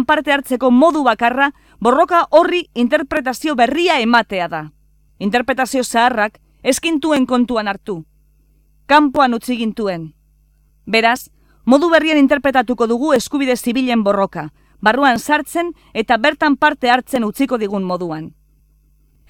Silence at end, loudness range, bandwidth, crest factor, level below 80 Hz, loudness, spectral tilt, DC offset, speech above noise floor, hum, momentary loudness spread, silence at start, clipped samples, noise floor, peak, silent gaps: 1 s; 3 LU; 17.5 kHz; 16 dB; -50 dBFS; -15 LUFS; -4 dB/octave; under 0.1%; 39 dB; none; 11 LU; 0 s; under 0.1%; -54 dBFS; 0 dBFS; none